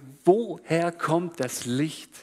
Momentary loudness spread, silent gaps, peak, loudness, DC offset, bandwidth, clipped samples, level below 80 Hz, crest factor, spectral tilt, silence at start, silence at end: 8 LU; none; -6 dBFS; -26 LUFS; under 0.1%; 15 kHz; under 0.1%; -72 dBFS; 20 dB; -5.5 dB/octave; 0 s; 0 s